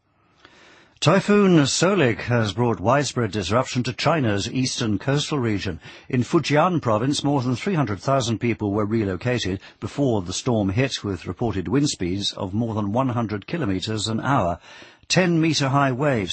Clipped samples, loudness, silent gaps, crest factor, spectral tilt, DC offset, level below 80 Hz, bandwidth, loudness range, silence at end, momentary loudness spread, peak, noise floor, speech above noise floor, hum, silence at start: under 0.1%; -22 LUFS; none; 18 dB; -5.5 dB/octave; under 0.1%; -52 dBFS; 8.8 kHz; 4 LU; 0 s; 8 LU; -4 dBFS; -55 dBFS; 34 dB; none; 1 s